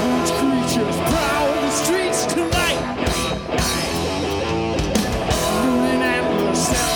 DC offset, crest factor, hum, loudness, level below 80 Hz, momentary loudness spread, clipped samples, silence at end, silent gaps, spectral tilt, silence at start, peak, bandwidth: under 0.1%; 16 dB; none; -19 LUFS; -34 dBFS; 4 LU; under 0.1%; 0 s; none; -4 dB/octave; 0 s; -4 dBFS; over 20 kHz